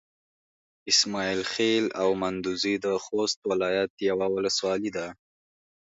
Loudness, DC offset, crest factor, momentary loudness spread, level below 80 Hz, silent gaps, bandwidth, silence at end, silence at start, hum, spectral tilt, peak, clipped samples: -26 LUFS; under 0.1%; 18 dB; 7 LU; -64 dBFS; 3.36-3.42 s, 3.90-3.97 s; 8 kHz; 0.75 s; 0.85 s; none; -3 dB/octave; -10 dBFS; under 0.1%